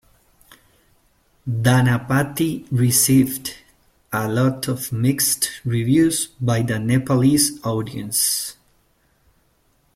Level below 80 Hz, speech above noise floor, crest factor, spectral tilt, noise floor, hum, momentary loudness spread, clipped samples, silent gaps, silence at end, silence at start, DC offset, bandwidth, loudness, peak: -52 dBFS; 43 dB; 18 dB; -4.5 dB/octave; -62 dBFS; none; 10 LU; under 0.1%; none; 1.45 s; 1.45 s; under 0.1%; 16.5 kHz; -19 LUFS; -4 dBFS